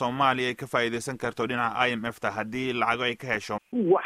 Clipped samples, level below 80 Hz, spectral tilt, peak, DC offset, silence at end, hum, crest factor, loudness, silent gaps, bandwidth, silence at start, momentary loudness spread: under 0.1%; -62 dBFS; -4.5 dB/octave; -8 dBFS; under 0.1%; 0 s; none; 20 dB; -27 LUFS; none; 15 kHz; 0 s; 7 LU